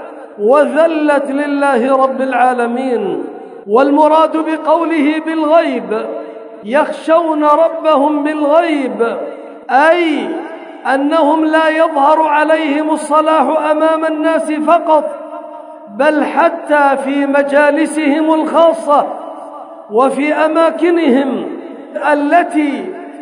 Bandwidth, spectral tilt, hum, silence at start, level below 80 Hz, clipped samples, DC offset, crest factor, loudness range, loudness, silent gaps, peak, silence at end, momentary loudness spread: 11 kHz; -4.5 dB/octave; none; 0 s; -74 dBFS; under 0.1%; under 0.1%; 12 dB; 2 LU; -12 LUFS; none; 0 dBFS; 0 s; 15 LU